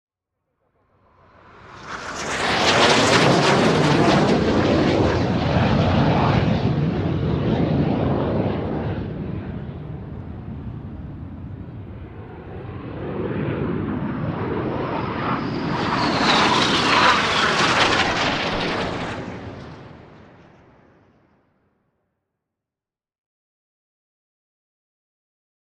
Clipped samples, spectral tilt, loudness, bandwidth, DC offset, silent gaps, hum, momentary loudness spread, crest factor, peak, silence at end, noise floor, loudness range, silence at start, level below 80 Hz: under 0.1%; -5 dB/octave; -19 LUFS; 12 kHz; under 0.1%; none; none; 20 LU; 20 dB; -2 dBFS; 5.55 s; under -90 dBFS; 15 LU; 1.55 s; -40 dBFS